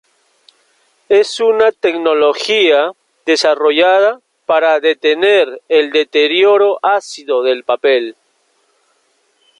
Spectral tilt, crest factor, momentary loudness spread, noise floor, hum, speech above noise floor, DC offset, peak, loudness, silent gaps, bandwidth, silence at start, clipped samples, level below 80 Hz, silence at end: -2 dB/octave; 12 dB; 6 LU; -59 dBFS; none; 47 dB; under 0.1%; 0 dBFS; -12 LUFS; none; 11 kHz; 1.1 s; under 0.1%; -64 dBFS; 1.5 s